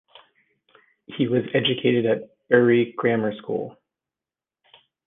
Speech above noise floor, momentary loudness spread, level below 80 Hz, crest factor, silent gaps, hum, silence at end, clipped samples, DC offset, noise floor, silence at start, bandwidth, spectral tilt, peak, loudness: over 69 dB; 12 LU; -68 dBFS; 22 dB; none; none; 1.35 s; under 0.1%; under 0.1%; under -90 dBFS; 1.1 s; 3.9 kHz; -9.5 dB/octave; -2 dBFS; -22 LUFS